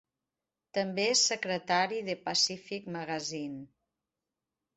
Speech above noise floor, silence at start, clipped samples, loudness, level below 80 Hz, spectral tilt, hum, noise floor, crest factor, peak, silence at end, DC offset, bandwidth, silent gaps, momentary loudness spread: 58 dB; 0.75 s; under 0.1%; -30 LUFS; -76 dBFS; -2 dB/octave; none; -90 dBFS; 20 dB; -14 dBFS; 1.1 s; under 0.1%; 8.4 kHz; none; 14 LU